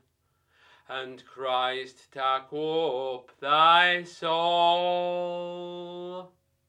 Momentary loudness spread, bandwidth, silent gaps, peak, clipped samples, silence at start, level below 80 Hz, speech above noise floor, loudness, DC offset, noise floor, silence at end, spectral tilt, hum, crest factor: 18 LU; 11 kHz; none; -8 dBFS; under 0.1%; 0.9 s; -82 dBFS; 45 dB; -25 LUFS; under 0.1%; -72 dBFS; 0.4 s; -4 dB/octave; none; 20 dB